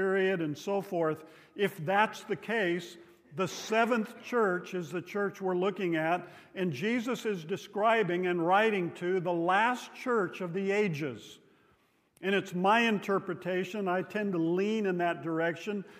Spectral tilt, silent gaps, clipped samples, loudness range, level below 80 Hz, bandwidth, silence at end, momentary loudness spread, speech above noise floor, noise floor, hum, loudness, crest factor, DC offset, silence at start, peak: -5.5 dB/octave; none; under 0.1%; 3 LU; -82 dBFS; 15.5 kHz; 0 s; 10 LU; 38 dB; -69 dBFS; none; -31 LUFS; 20 dB; under 0.1%; 0 s; -12 dBFS